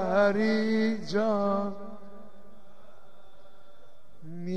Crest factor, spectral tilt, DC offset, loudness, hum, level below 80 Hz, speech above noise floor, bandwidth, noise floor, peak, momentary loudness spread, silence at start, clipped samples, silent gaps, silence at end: 18 dB; -6.5 dB/octave; 1%; -27 LUFS; none; -66 dBFS; 33 dB; 9.2 kHz; -59 dBFS; -12 dBFS; 21 LU; 0 s; under 0.1%; none; 0 s